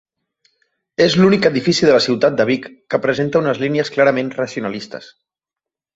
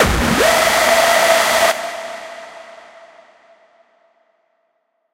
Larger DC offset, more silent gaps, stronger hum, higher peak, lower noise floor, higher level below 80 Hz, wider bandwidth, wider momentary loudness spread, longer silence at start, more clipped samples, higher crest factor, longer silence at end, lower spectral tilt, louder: neither; neither; neither; about the same, -2 dBFS vs 0 dBFS; first, -87 dBFS vs -67 dBFS; second, -56 dBFS vs -34 dBFS; second, 8 kHz vs 16 kHz; second, 13 LU vs 20 LU; first, 1 s vs 0 s; neither; about the same, 16 dB vs 18 dB; second, 0.9 s vs 2.4 s; first, -5.5 dB/octave vs -2.5 dB/octave; second, -16 LUFS vs -13 LUFS